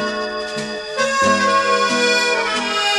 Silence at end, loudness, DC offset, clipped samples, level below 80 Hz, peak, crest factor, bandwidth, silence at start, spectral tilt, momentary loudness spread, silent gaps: 0 s; -17 LUFS; under 0.1%; under 0.1%; -54 dBFS; -4 dBFS; 14 dB; 13 kHz; 0 s; -2 dB/octave; 9 LU; none